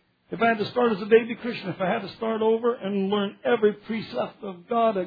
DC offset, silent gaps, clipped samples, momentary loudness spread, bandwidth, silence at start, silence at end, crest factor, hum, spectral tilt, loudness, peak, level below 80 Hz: under 0.1%; none; under 0.1%; 10 LU; 5 kHz; 0.3 s; 0 s; 20 dB; none; -8.5 dB/octave; -25 LUFS; -6 dBFS; -66 dBFS